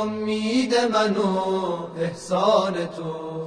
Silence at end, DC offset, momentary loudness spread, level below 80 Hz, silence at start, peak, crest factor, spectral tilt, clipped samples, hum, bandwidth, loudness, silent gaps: 0 s; under 0.1%; 9 LU; -62 dBFS; 0 s; -6 dBFS; 16 dB; -5 dB/octave; under 0.1%; none; 10.5 kHz; -23 LUFS; none